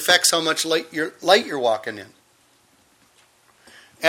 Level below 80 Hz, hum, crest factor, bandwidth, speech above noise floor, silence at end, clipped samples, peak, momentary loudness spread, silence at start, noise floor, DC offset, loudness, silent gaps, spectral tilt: -70 dBFS; none; 22 dB; 16.5 kHz; 39 dB; 0 s; under 0.1%; 0 dBFS; 13 LU; 0 s; -59 dBFS; under 0.1%; -19 LUFS; none; -1 dB/octave